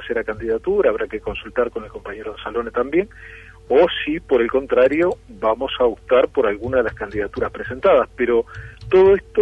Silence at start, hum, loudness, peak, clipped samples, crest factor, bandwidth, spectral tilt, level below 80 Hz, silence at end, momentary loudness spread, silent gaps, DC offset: 0 s; none; -19 LUFS; -4 dBFS; under 0.1%; 14 dB; 5.8 kHz; -7 dB/octave; -42 dBFS; 0 s; 14 LU; none; under 0.1%